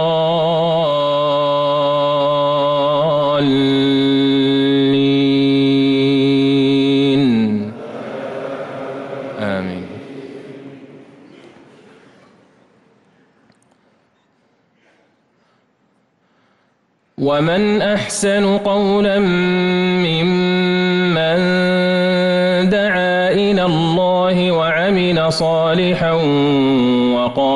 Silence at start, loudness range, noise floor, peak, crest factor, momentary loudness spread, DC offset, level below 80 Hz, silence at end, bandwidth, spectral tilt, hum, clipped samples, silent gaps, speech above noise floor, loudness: 0 s; 13 LU; -61 dBFS; -6 dBFS; 10 dB; 12 LU; under 0.1%; -50 dBFS; 0 s; 11.5 kHz; -6 dB/octave; none; under 0.1%; none; 47 dB; -15 LUFS